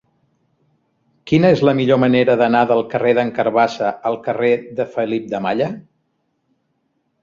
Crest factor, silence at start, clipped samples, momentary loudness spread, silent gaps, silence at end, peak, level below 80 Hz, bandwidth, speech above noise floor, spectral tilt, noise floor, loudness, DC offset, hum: 16 dB; 1.25 s; under 0.1%; 8 LU; none; 1.4 s; -2 dBFS; -58 dBFS; 7.4 kHz; 52 dB; -7.5 dB/octave; -68 dBFS; -17 LUFS; under 0.1%; none